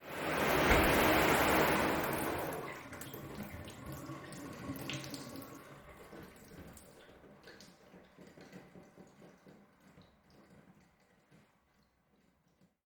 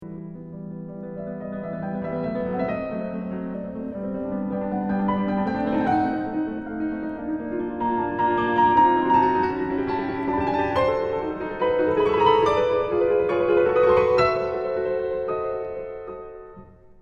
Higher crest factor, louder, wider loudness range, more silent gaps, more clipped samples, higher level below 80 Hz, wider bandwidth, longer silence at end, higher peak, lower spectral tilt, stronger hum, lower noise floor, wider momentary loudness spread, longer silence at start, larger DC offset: about the same, 22 dB vs 18 dB; second, -33 LUFS vs -23 LUFS; first, 27 LU vs 9 LU; neither; neither; about the same, -52 dBFS vs -48 dBFS; first, over 20 kHz vs 7.4 kHz; first, 2.85 s vs 0.1 s; second, -14 dBFS vs -6 dBFS; second, -4 dB/octave vs -8 dB/octave; neither; first, -73 dBFS vs -46 dBFS; first, 27 LU vs 15 LU; about the same, 0 s vs 0 s; neither